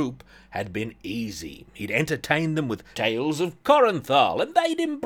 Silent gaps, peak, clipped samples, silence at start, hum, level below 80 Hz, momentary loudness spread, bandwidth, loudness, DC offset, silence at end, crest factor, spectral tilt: none; -4 dBFS; under 0.1%; 0 s; none; -56 dBFS; 14 LU; 19 kHz; -24 LUFS; under 0.1%; 0 s; 20 dB; -5 dB/octave